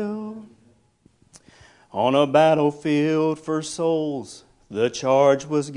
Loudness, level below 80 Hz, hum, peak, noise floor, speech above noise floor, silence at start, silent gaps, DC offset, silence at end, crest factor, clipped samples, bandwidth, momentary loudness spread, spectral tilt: -21 LUFS; -64 dBFS; none; -4 dBFS; -60 dBFS; 39 dB; 0 s; none; under 0.1%; 0 s; 20 dB; under 0.1%; 11 kHz; 17 LU; -5.5 dB/octave